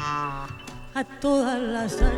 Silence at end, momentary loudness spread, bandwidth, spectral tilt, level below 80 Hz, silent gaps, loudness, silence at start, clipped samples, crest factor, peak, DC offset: 0 s; 13 LU; 12.5 kHz; -5.5 dB/octave; -30 dBFS; none; -27 LUFS; 0 s; under 0.1%; 18 dB; -8 dBFS; under 0.1%